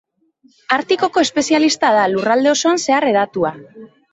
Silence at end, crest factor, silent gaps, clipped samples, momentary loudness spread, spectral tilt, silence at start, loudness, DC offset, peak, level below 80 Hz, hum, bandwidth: 0.25 s; 14 dB; none; under 0.1%; 6 LU; -3 dB/octave; 0.7 s; -15 LUFS; under 0.1%; -2 dBFS; -60 dBFS; none; 8.2 kHz